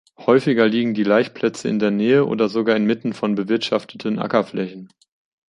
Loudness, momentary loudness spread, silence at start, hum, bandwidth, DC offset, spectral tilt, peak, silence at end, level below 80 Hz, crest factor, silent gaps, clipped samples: -19 LUFS; 7 LU; 0.2 s; none; 10.5 kHz; under 0.1%; -6.5 dB/octave; -2 dBFS; 0.65 s; -64 dBFS; 18 dB; none; under 0.1%